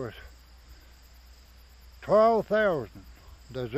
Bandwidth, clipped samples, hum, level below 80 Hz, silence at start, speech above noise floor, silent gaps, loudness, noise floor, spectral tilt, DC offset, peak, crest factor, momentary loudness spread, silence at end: 15 kHz; under 0.1%; none; -52 dBFS; 0 s; 28 dB; none; -25 LUFS; -53 dBFS; -6.5 dB/octave; under 0.1%; -10 dBFS; 18 dB; 22 LU; 0 s